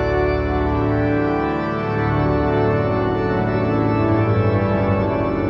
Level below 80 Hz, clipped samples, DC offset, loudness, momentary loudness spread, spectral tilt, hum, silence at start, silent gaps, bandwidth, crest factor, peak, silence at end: -32 dBFS; under 0.1%; under 0.1%; -19 LUFS; 2 LU; -9.5 dB/octave; none; 0 s; none; 5.8 kHz; 12 dB; -6 dBFS; 0 s